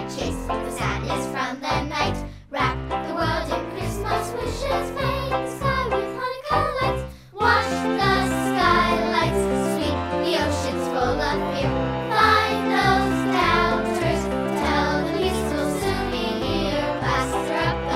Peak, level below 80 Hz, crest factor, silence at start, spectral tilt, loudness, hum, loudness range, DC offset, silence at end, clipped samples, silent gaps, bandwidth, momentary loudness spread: -4 dBFS; -36 dBFS; 18 dB; 0 s; -5 dB/octave; -23 LUFS; none; 5 LU; under 0.1%; 0 s; under 0.1%; none; 16 kHz; 8 LU